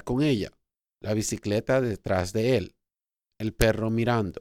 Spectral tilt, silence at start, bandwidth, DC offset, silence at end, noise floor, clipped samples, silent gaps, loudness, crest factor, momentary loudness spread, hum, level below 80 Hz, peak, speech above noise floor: -5.5 dB/octave; 0.05 s; 16.5 kHz; under 0.1%; 0 s; -89 dBFS; under 0.1%; none; -26 LUFS; 22 dB; 10 LU; none; -44 dBFS; -4 dBFS; 64 dB